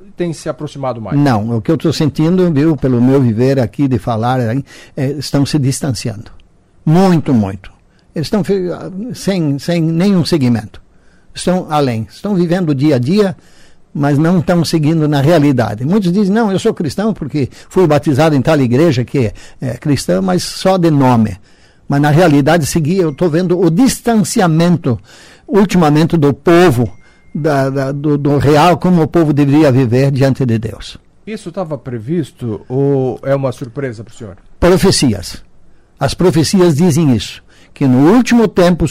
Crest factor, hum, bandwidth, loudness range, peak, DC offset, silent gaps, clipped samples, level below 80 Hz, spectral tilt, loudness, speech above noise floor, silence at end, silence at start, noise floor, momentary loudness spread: 10 dB; none; 16 kHz; 4 LU; -2 dBFS; under 0.1%; none; under 0.1%; -38 dBFS; -6.5 dB/octave; -13 LUFS; 32 dB; 0 s; 0.1 s; -44 dBFS; 13 LU